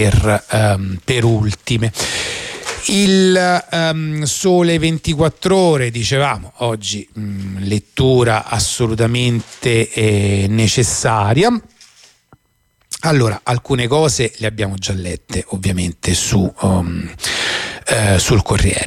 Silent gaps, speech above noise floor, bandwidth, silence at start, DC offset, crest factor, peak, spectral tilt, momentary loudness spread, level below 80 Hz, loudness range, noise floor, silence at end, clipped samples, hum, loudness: none; 45 dB; 15.5 kHz; 0 s; under 0.1%; 14 dB; -2 dBFS; -4.5 dB/octave; 8 LU; -34 dBFS; 3 LU; -60 dBFS; 0 s; under 0.1%; none; -16 LUFS